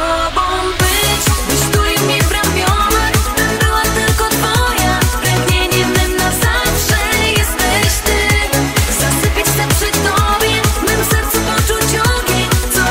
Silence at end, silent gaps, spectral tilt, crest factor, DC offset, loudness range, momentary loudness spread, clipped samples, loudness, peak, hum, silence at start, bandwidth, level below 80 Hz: 0 s; none; -3.5 dB/octave; 14 dB; under 0.1%; 0 LU; 2 LU; under 0.1%; -13 LUFS; 0 dBFS; none; 0 s; 16.5 kHz; -22 dBFS